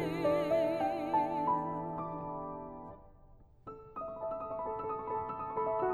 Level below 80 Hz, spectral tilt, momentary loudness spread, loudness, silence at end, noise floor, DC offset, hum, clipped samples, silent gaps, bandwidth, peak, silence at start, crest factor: -60 dBFS; -7.5 dB/octave; 18 LU; -35 LUFS; 0 s; -59 dBFS; under 0.1%; none; under 0.1%; none; 13.5 kHz; -20 dBFS; 0 s; 16 dB